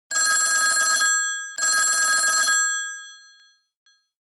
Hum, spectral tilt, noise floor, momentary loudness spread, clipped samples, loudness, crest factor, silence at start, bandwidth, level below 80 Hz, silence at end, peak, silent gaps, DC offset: none; 4.5 dB/octave; -56 dBFS; 8 LU; under 0.1%; -18 LUFS; 12 dB; 0.1 s; 15 kHz; -84 dBFS; 1.05 s; -10 dBFS; none; under 0.1%